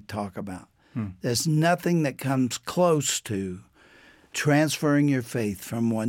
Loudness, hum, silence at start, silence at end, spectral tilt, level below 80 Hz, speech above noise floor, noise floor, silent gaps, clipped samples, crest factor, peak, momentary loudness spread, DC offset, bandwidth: -25 LUFS; none; 0.1 s; 0 s; -5 dB/octave; -64 dBFS; 30 dB; -54 dBFS; none; under 0.1%; 16 dB; -10 dBFS; 14 LU; under 0.1%; 17 kHz